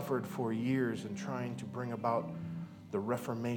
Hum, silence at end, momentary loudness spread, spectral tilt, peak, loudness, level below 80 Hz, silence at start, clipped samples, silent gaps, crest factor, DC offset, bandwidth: none; 0 s; 8 LU; -7 dB/octave; -18 dBFS; -37 LUFS; -76 dBFS; 0 s; under 0.1%; none; 18 dB; under 0.1%; 19 kHz